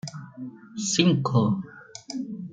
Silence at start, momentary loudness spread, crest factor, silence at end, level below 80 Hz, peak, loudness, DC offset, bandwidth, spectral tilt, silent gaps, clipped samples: 0.05 s; 20 LU; 20 dB; 0 s; -66 dBFS; -6 dBFS; -24 LUFS; under 0.1%; 9.4 kHz; -5 dB/octave; none; under 0.1%